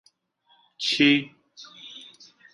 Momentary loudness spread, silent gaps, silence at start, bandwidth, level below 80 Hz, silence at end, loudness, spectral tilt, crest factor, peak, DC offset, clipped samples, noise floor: 24 LU; none; 0.8 s; 11 kHz; -74 dBFS; 0.5 s; -21 LUFS; -3.5 dB/octave; 24 dB; -4 dBFS; under 0.1%; under 0.1%; -65 dBFS